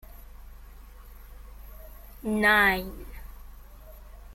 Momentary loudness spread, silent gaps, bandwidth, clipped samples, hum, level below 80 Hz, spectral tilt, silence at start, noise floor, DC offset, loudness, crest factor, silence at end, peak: 29 LU; none; 16.5 kHz; under 0.1%; none; -44 dBFS; -4 dB/octave; 0.1 s; -46 dBFS; under 0.1%; -23 LUFS; 20 dB; 0 s; -10 dBFS